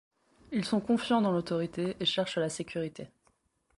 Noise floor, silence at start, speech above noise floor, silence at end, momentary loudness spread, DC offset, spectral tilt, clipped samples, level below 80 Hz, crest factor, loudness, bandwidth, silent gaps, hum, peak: -72 dBFS; 0.5 s; 42 dB; 0.7 s; 10 LU; under 0.1%; -5 dB/octave; under 0.1%; -66 dBFS; 16 dB; -31 LUFS; 11.5 kHz; none; none; -16 dBFS